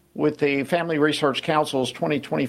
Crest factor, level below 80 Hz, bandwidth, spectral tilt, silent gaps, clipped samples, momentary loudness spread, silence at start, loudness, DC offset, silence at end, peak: 16 dB; -64 dBFS; 14 kHz; -5 dB/octave; none; under 0.1%; 4 LU; 0.15 s; -23 LUFS; under 0.1%; 0 s; -6 dBFS